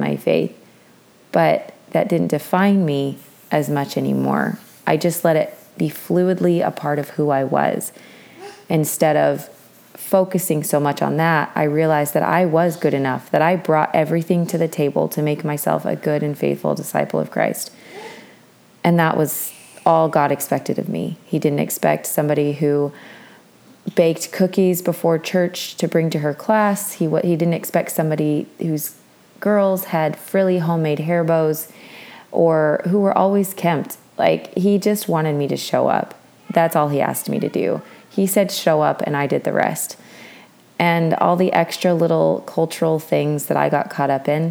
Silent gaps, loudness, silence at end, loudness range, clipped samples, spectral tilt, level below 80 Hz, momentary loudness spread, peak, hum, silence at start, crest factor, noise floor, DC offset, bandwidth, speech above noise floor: none; -19 LUFS; 0 s; 3 LU; under 0.1%; -6 dB/octave; -70 dBFS; 8 LU; 0 dBFS; none; 0 s; 18 dB; -50 dBFS; under 0.1%; over 20 kHz; 32 dB